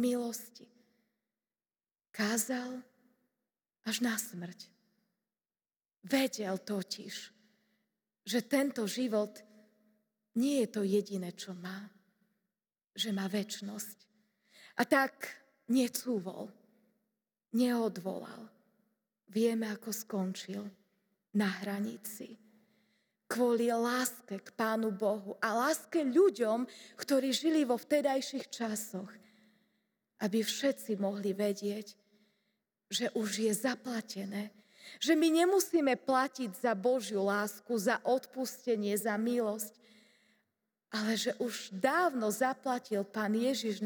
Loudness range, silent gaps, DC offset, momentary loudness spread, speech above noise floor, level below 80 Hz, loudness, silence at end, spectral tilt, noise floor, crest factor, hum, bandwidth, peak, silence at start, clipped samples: 8 LU; none; under 0.1%; 14 LU; over 57 dB; under -90 dBFS; -33 LUFS; 0 s; -4 dB/octave; under -90 dBFS; 20 dB; none; over 20 kHz; -14 dBFS; 0 s; under 0.1%